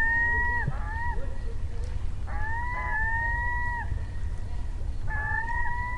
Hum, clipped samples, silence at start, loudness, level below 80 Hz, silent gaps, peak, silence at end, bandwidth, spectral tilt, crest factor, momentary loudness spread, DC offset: none; under 0.1%; 0 s; -30 LUFS; -32 dBFS; none; -14 dBFS; 0 s; 9 kHz; -6.5 dB/octave; 12 dB; 11 LU; under 0.1%